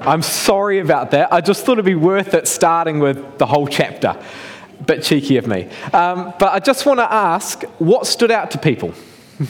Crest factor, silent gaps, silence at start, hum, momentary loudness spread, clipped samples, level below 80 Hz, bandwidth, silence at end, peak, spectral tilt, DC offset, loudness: 14 dB; none; 0 s; none; 9 LU; under 0.1%; -54 dBFS; 18.5 kHz; 0 s; -2 dBFS; -4.5 dB/octave; under 0.1%; -16 LUFS